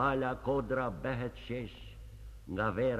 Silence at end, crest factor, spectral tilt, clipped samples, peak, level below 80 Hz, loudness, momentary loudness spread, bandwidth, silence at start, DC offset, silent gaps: 0 s; 18 dB; -8 dB/octave; under 0.1%; -18 dBFS; -50 dBFS; -35 LUFS; 19 LU; 13.5 kHz; 0 s; under 0.1%; none